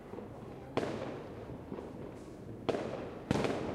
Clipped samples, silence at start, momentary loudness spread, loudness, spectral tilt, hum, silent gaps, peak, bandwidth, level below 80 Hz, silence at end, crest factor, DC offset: under 0.1%; 0 s; 13 LU; -40 LUFS; -6.5 dB/octave; none; none; -16 dBFS; 15 kHz; -58 dBFS; 0 s; 24 dB; under 0.1%